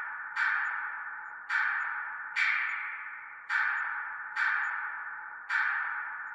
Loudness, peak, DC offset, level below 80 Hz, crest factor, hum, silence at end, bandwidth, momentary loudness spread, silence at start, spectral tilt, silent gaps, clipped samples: -31 LUFS; -16 dBFS; under 0.1%; -84 dBFS; 18 dB; none; 0 s; 11 kHz; 11 LU; 0 s; 1.5 dB/octave; none; under 0.1%